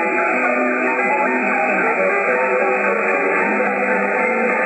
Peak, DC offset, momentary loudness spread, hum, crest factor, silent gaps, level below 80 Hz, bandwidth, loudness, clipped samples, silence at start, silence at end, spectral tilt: -4 dBFS; under 0.1%; 1 LU; none; 14 dB; none; -72 dBFS; 8.8 kHz; -17 LUFS; under 0.1%; 0 s; 0 s; -6.5 dB/octave